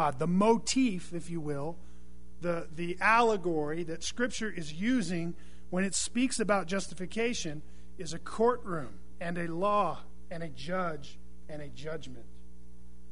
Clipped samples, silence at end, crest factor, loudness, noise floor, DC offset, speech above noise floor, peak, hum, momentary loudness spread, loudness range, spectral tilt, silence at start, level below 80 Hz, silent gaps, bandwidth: under 0.1%; 0 s; 22 dB; -32 LUFS; -54 dBFS; 2%; 22 dB; -12 dBFS; none; 19 LU; 5 LU; -4.5 dB/octave; 0 s; -54 dBFS; none; 11 kHz